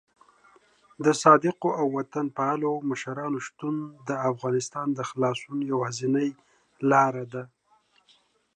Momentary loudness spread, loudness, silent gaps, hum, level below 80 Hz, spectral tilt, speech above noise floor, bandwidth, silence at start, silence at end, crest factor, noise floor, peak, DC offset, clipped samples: 11 LU; -26 LUFS; none; none; -78 dBFS; -5.5 dB/octave; 39 dB; 11 kHz; 1 s; 1.1 s; 24 dB; -65 dBFS; -4 dBFS; under 0.1%; under 0.1%